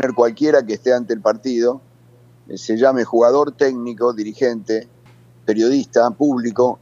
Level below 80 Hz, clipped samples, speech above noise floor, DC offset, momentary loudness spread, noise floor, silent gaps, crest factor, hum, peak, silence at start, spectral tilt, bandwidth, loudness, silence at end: -68 dBFS; under 0.1%; 32 dB; under 0.1%; 9 LU; -49 dBFS; none; 18 dB; none; 0 dBFS; 0 s; -5.5 dB/octave; 7.6 kHz; -17 LUFS; 0.05 s